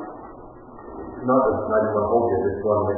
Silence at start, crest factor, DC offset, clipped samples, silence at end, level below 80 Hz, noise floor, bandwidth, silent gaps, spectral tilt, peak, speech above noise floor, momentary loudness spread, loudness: 0 s; 16 dB; under 0.1%; under 0.1%; 0 s; -46 dBFS; -41 dBFS; 2.1 kHz; none; -15 dB/octave; -6 dBFS; 21 dB; 22 LU; -21 LUFS